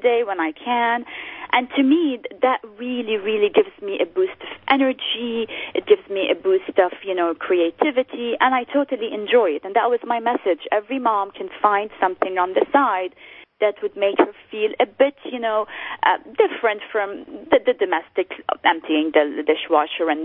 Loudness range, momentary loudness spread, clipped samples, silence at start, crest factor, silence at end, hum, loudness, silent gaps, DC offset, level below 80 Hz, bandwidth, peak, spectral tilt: 1 LU; 7 LU; under 0.1%; 0 s; 20 dB; 0 s; none; -21 LUFS; none; under 0.1%; -66 dBFS; 4.2 kHz; -2 dBFS; -8.5 dB/octave